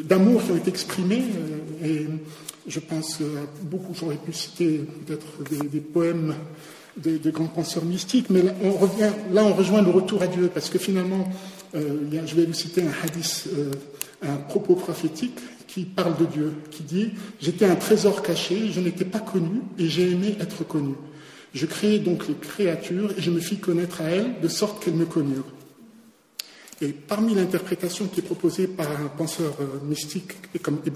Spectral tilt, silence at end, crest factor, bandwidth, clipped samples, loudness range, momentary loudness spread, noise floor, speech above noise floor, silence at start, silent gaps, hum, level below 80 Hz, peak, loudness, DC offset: -5.5 dB/octave; 0 s; 20 dB; 16 kHz; under 0.1%; 7 LU; 13 LU; -53 dBFS; 29 dB; 0 s; none; none; -66 dBFS; -4 dBFS; -25 LUFS; under 0.1%